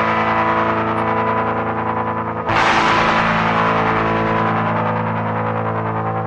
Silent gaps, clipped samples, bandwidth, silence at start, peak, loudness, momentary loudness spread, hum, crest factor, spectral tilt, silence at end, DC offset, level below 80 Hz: none; under 0.1%; 10 kHz; 0 s; -2 dBFS; -17 LUFS; 7 LU; none; 14 dB; -6 dB/octave; 0 s; under 0.1%; -42 dBFS